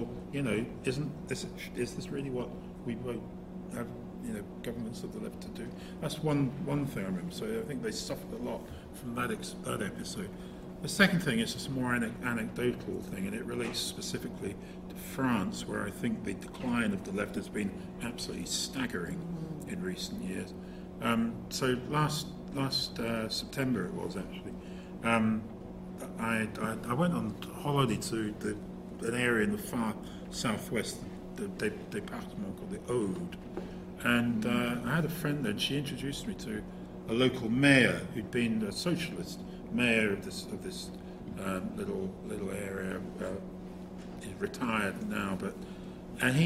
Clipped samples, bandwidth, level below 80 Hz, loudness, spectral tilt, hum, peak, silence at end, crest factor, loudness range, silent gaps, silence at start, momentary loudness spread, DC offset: under 0.1%; 16 kHz; -54 dBFS; -34 LUFS; -5 dB/octave; none; -8 dBFS; 0 s; 26 dB; 8 LU; none; 0 s; 13 LU; under 0.1%